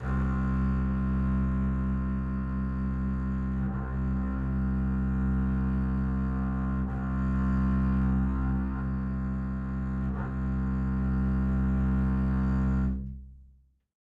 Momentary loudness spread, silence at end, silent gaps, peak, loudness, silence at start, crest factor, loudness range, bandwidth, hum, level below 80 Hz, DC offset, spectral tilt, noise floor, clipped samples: 5 LU; 0.6 s; none; -18 dBFS; -30 LUFS; 0 s; 10 dB; 2 LU; 3.2 kHz; none; -32 dBFS; under 0.1%; -10.5 dB/octave; -60 dBFS; under 0.1%